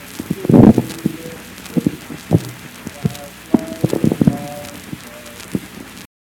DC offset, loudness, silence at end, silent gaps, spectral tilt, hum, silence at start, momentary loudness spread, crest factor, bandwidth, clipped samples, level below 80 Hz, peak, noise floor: under 0.1%; -17 LUFS; 0.2 s; none; -7 dB/octave; none; 0 s; 22 LU; 18 dB; 18 kHz; 0.3%; -42 dBFS; 0 dBFS; -35 dBFS